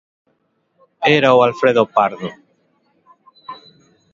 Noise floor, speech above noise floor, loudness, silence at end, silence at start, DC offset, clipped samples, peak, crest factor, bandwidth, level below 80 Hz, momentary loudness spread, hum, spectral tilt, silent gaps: -65 dBFS; 51 dB; -14 LUFS; 0.6 s; 1 s; under 0.1%; under 0.1%; 0 dBFS; 18 dB; 7.4 kHz; -64 dBFS; 25 LU; none; -6 dB/octave; none